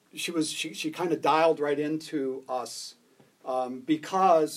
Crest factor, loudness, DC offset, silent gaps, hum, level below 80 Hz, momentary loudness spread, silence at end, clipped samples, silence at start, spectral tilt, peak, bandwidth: 18 dB; -28 LUFS; under 0.1%; none; none; -88 dBFS; 11 LU; 0 s; under 0.1%; 0.15 s; -4 dB/octave; -8 dBFS; 15 kHz